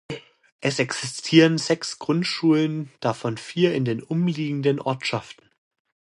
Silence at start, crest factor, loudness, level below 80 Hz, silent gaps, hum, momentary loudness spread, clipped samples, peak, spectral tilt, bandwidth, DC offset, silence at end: 0.1 s; 22 dB; -23 LUFS; -66 dBFS; 0.52-0.59 s; none; 10 LU; under 0.1%; -2 dBFS; -5.5 dB/octave; 11 kHz; under 0.1%; 0.85 s